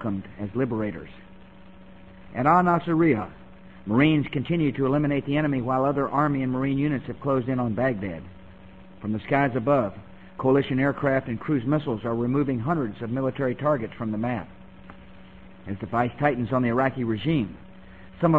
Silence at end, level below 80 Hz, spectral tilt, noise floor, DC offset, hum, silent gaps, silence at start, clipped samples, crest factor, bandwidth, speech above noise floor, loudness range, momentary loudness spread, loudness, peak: 0 s; -52 dBFS; -9.5 dB/octave; -48 dBFS; 0.3%; none; none; 0 s; under 0.1%; 20 dB; 7.4 kHz; 24 dB; 4 LU; 13 LU; -25 LUFS; -6 dBFS